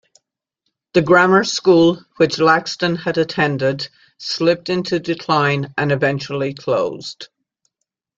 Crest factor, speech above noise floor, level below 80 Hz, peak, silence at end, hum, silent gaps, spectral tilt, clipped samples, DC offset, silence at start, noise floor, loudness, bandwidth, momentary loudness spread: 16 dB; 61 dB; -58 dBFS; -2 dBFS; 0.95 s; none; none; -5.5 dB/octave; under 0.1%; under 0.1%; 0.95 s; -78 dBFS; -17 LUFS; 7.8 kHz; 12 LU